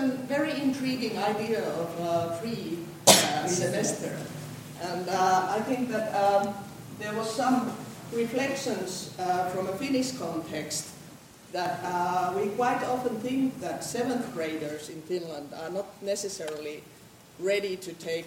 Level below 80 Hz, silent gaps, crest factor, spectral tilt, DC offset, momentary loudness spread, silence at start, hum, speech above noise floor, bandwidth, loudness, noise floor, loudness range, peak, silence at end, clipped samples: -68 dBFS; none; 26 dB; -3.5 dB/octave; under 0.1%; 13 LU; 0 s; none; 20 dB; 16.5 kHz; -29 LUFS; -49 dBFS; 8 LU; -4 dBFS; 0 s; under 0.1%